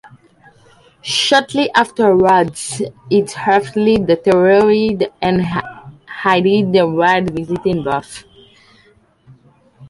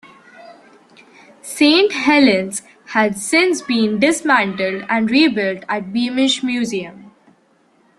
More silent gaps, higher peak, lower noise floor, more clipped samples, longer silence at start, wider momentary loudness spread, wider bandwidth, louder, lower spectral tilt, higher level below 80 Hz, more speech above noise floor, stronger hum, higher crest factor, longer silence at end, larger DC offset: neither; about the same, 0 dBFS vs 0 dBFS; second, -52 dBFS vs -56 dBFS; neither; first, 1.05 s vs 0.4 s; about the same, 11 LU vs 12 LU; about the same, 11.5 kHz vs 12.5 kHz; about the same, -14 LUFS vs -16 LUFS; first, -5 dB/octave vs -3.5 dB/octave; first, -48 dBFS vs -60 dBFS; about the same, 38 dB vs 40 dB; neither; about the same, 16 dB vs 18 dB; second, 0.05 s vs 0.9 s; neither